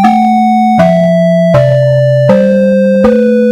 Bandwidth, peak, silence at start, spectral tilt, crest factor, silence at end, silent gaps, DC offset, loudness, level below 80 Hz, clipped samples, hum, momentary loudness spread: 11 kHz; 0 dBFS; 0 s; -8.5 dB/octave; 6 dB; 0 s; none; under 0.1%; -7 LUFS; -40 dBFS; 0.8%; none; 1 LU